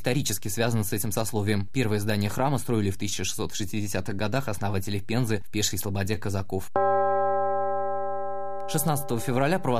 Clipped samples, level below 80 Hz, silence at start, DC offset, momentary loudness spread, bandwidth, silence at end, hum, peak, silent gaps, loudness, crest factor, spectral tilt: under 0.1%; -54 dBFS; 0.05 s; 3%; 6 LU; 15 kHz; 0 s; none; -8 dBFS; none; -27 LUFS; 18 dB; -5 dB/octave